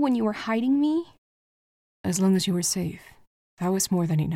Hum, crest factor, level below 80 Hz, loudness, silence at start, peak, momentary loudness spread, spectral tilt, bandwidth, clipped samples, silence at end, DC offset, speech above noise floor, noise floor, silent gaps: none; 14 dB; -60 dBFS; -25 LUFS; 0 s; -12 dBFS; 11 LU; -5 dB/octave; 16.5 kHz; under 0.1%; 0 s; under 0.1%; over 66 dB; under -90 dBFS; 1.18-2.04 s, 3.27-3.57 s